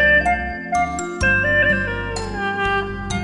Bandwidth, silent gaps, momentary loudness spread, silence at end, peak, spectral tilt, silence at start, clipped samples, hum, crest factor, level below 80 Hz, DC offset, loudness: 11.5 kHz; none; 9 LU; 0 s; -6 dBFS; -4.5 dB/octave; 0 s; under 0.1%; none; 14 dB; -34 dBFS; under 0.1%; -19 LUFS